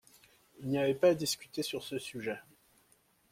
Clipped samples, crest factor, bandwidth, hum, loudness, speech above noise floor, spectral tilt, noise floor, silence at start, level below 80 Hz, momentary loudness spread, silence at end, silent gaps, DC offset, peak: under 0.1%; 20 dB; 16.5 kHz; none; -33 LUFS; 37 dB; -4.5 dB/octave; -69 dBFS; 0.6 s; -72 dBFS; 13 LU; 0.9 s; none; under 0.1%; -16 dBFS